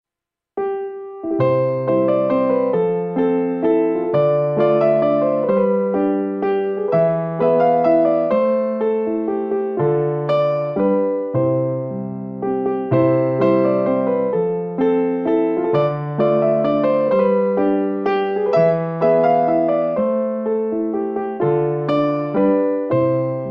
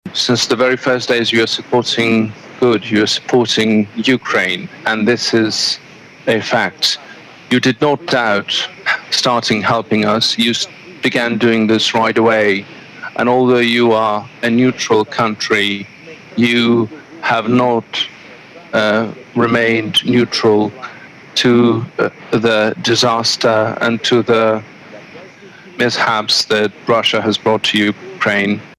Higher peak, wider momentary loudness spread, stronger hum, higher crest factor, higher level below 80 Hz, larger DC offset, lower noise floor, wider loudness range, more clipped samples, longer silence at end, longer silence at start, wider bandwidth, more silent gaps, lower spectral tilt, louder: second, -4 dBFS vs 0 dBFS; about the same, 6 LU vs 8 LU; neither; about the same, 14 dB vs 14 dB; second, -62 dBFS vs -56 dBFS; neither; first, -86 dBFS vs -38 dBFS; about the same, 2 LU vs 2 LU; neither; about the same, 0 s vs 0.1 s; first, 0.55 s vs 0.05 s; second, 5.6 kHz vs 14.5 kHz; neither; first, -10.5 dB/octave vs -4 dB/octave; second, -18 LUFS vs -14 LUFS